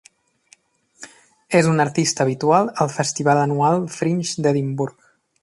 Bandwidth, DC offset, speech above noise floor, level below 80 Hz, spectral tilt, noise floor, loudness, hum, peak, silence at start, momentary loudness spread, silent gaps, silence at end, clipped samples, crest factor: 11.5 kHz; under 0.1%; 38 dB; -62 dBFS; -5 dB/octave; -56 dBFS; -19 LUFS; none; -4 dBFS; 1 s; 5 LU; none; 0.5 s; under 0.1%; 18 dB